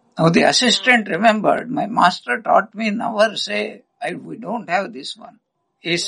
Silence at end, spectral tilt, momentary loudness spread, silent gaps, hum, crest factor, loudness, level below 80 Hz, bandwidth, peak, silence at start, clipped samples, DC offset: 0 s; -4 dB/octave; 16 LU; none; none; 18 dB; -17 LUFS; -64 dBFS; 11.5 kHz; 0 dBFS; 0.15 s; under 0.1%; under 0.1%